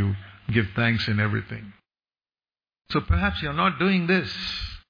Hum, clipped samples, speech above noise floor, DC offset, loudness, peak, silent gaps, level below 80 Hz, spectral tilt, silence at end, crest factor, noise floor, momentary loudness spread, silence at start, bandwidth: none; under 0.1%; over 66 dB; under 0.1%; -24 LUFS; -10 dBFS; none; -38 dBFS; -7 dB/octave; 0.1 s; 16 dB; under -90 dBFS; 9 LU; 0 s; 5.2 kHz